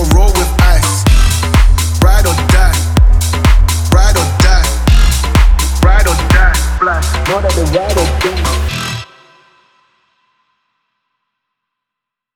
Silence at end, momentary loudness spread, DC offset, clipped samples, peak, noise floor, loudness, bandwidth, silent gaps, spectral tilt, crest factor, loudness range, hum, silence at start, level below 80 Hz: 3.3 s; 4 LU; under 0.1%; under 0.1%; 0 dBFS; -81 dBFS; -11 LUFS; 17 kHz; none; -4.5 dB/octave; 10 dB; 8 LU; none; 0 s; -12 dBFS